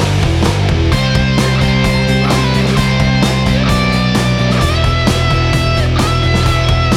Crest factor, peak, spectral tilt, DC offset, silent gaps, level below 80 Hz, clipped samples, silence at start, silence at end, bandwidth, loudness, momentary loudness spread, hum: 12 dB; 0 dBFS; -5.5 dB/octave; under 0.1%; none; -20 dBFS; under 0.1%; 0 s; 0 s; 14.5 kHz; -12 LUFS; 1 LU; none